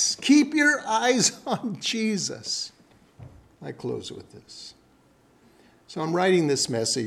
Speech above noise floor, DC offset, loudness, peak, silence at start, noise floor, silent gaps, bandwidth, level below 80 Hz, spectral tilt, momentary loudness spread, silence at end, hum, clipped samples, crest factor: 35 dB; under 0.1%; -23 LUFS; -6 dBFS; 0 s; -59 dBFS; none; 14 kHz; -66 dBFS; -3 dB/octave; 22 LU; 0 s; none; under 0.1%; 20 dB